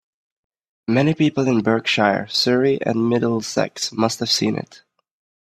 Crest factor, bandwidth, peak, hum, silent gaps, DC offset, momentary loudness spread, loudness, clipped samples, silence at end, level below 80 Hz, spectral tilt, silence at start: 20 dB; 14 kHz; 0 dBFS; none; none; under 0.1%; 6 LU; -19 LUFS; under 0.1%; 0.65 s; -60 dBFS; -4.5 dB/octave; 0.9 s